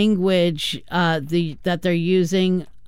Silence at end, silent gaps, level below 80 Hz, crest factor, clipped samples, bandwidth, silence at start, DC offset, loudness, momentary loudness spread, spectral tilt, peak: 0.2 s; none; -50 dBFS; 12 dB; under 0.1%; 15.5 kHz; 0 s; 1%; -20 LUFS; 5 LU; -6 dB/octave; -8 dBFS